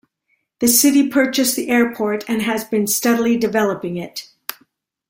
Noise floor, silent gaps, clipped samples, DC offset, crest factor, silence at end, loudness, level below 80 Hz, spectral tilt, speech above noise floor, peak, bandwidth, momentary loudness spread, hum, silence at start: -68 dBFS; none; under 0.1%; under 0.1%; 18 dB; 0.55 s; -17 LUFS; -60 dBFS; -3 dB/octave; 51 dB; -2 dBFS; 16.5 kHz; 16 LU; none; 0.6 s